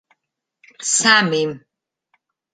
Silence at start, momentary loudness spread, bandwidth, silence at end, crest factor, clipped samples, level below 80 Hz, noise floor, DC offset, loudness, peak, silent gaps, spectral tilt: 0.8 s; 14 LU; 9.4 kHz; 0.95 s; 22 dB; under 0.1%; -68 dBFS; -78 dBFS; under 0.1%; -16 LUFS; 0 dBFS; none; -2 dB/octave